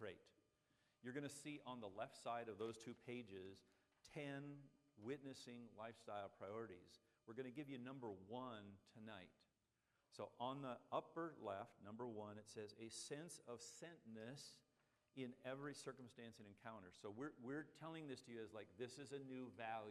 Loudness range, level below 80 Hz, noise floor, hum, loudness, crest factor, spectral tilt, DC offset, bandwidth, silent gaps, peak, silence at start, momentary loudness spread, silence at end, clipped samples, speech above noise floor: 4 LU; under -90 dBFS; -88 dBFS; none; -55 LUFS; 24 dB; -5 dB/octave; under 0.1%; 13 kHz; none; -32 dBFS; 0 s; 9 LU; 0 s; under 0.1%; 34 dB